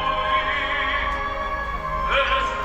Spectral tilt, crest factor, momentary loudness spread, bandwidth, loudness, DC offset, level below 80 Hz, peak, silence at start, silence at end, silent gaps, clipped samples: -4 dB/octave; 14 dB; 7 LU; 16 kHz; -22 LUFS; under 0.1%; -34 dBFS; -8 dBFS; 0 s; 0 s; none; under 0.1%